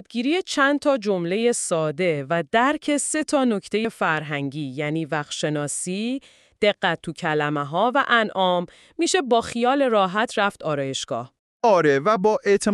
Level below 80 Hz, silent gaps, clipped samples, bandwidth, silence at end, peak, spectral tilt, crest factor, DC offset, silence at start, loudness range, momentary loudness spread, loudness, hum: -64 dBFS; 11.39-11.60 s; under 0.1%; 13 kHz; 0 s; -4 dBFS; -4 dB/octave; 18 dB; under 0.1%; 0.1 s; 4 LU; 8 LU; -22 LUFS; none